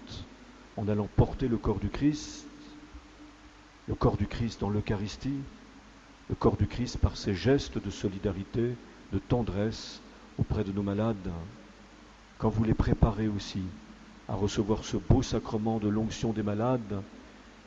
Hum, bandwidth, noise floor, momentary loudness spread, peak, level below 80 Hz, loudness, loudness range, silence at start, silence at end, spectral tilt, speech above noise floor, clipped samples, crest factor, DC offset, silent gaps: none; 8 kHz; -53 dBFS; 21 LU; -8 dBFS; -42 dBFS; -31 LUFS; 4 LU; 0 s; 0.05 s; -7 dB/octave; 24 dB; under 0.1%; 24 dB; under 0.1%; none